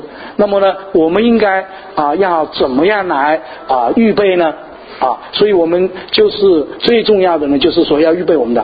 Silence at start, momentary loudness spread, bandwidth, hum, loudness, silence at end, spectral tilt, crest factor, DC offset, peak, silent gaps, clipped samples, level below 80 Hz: 0 s; 7 LU; 5 kHz; none; -12 LUFS; 0 s; -8.5 dB/octave; 12 dB; under 0.1%; 0 dBFS; none; under 0.1%; -46 dBFS